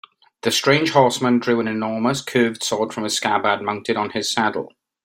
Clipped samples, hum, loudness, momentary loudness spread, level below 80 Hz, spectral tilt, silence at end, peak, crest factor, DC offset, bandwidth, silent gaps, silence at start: under 0.1%; none; -20 LUFS; 7 LU; -62 dBFS; -4 dB/octave; 0.4 s; -2 dBFS; 18 dB; under 0.1%; 16.5 kHz; none; 0.45 s